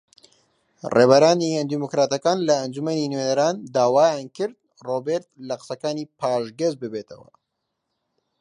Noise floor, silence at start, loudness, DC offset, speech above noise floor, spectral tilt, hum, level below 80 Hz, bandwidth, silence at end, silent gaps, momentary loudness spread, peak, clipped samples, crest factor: -78 dBFS; 0.85 s; -22 LUFS; under 0.1%; 57 dB; -5 dB/octave; none; -70 dBFS; 10.5 kHz; 1.25 s; none; 16 LU; 0 dBFS; under 0.1%; 22 dB